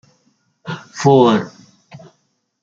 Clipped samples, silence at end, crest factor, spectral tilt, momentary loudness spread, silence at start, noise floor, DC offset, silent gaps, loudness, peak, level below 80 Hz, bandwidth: under 0.1%; 1.15 s; 18 dB; -6.5 dB/octave; 22 LU; 0.65 s; -66 dBFS; under 0.1%; none; -14 LUFS; -2 dBFS; -62 dBFS; 7.8 kHz